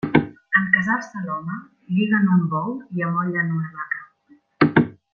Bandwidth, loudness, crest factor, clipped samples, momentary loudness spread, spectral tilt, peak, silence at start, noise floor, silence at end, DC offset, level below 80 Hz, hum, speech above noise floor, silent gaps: 6.8 kHz; -21 LUFS; 20 dB; under 0.1%; 11 LU; -8 dB/octave; -2 dBFS; 0.05 s; -56 dBFS; 0.2 s; under 0.1%; -58 dBFS; none; 34 dB; none